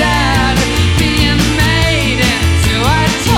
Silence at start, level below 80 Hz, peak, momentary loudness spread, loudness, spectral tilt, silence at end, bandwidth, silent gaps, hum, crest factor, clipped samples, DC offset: 0 s; -20 dBFS; 0 dBFS; 1 LU; -11 LUFS; -4.5 dB/octave; 0 s; 17 kHz; none; none; 12 dB; under 0.1%; under 0.1%